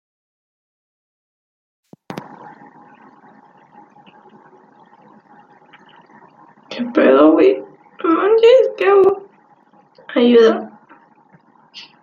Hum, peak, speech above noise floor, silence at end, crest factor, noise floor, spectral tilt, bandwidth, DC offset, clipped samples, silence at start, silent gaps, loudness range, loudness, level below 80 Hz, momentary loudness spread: none; -2 dBFS; 41 dB; 0.2 s; 16 dB; -52 dBFS; -6 dB/octave; 7.2 kHz; under 0.1%; under 0.1%; 2.1 s; none; 5 LU; -13 LUFS; -68 dBFS; 23 LU